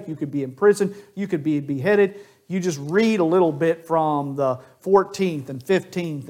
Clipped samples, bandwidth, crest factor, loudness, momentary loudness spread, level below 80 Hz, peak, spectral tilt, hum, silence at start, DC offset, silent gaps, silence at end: under 0.1%; 15.5 kHz; 18 dB; -22 LUFS; 9 LU; -68 dBFS; -2 dBFS; -6.5 dB/octave; none; 0 s; under 0.1%; none; 0 s